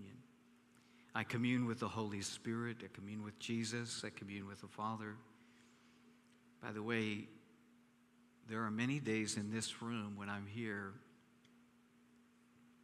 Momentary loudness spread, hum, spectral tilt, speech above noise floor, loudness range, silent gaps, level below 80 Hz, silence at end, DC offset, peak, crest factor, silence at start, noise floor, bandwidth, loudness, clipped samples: 13 LU; none; -4.5 dB/octave; 28 dB; 6 LU; none; -84 dBFS; 0.15 s; under 0.1%; -22 dBFS; 24 dB; 0 s; -70 dBFS; 14 kHz; -43 LUFS; under 0.1%